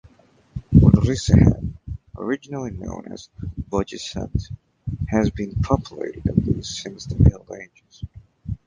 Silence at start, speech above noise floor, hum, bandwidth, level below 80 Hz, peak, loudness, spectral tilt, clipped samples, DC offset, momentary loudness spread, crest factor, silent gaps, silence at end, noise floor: 0.55 s; 33 dB; none; 9.6 kHz; -30 dBFS; 0 dBFS; -21 LUFS; -7.5 dB/octave; under 0.1%; under 0.1%; 23 LU; 22 dB; none; 0.1 s; -55 dBFS